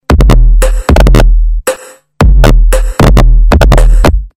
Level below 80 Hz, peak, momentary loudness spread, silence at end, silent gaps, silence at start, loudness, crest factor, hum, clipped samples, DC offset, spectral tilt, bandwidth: -6 dBFS; 0 dBFS; 6 LU; 0.1 s; none; 0.1 s; -8 LUFS; 4 dB; none; 1%; under 0.1%; -6 dB/octave; 14 kHz